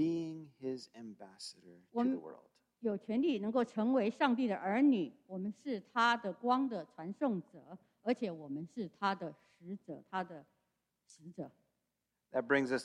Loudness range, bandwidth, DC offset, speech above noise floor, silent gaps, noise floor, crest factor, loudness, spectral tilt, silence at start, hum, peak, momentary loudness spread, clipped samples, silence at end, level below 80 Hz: 10 LU; 11 kHz; under 0.1%; 51 dB; none; -87 dBFS; 20 dB; -36 LUFS; -6 dB/octave; 0 s; none; -16 dBFS; 18 LU; under 0.1%; 0 s; -84 dBFS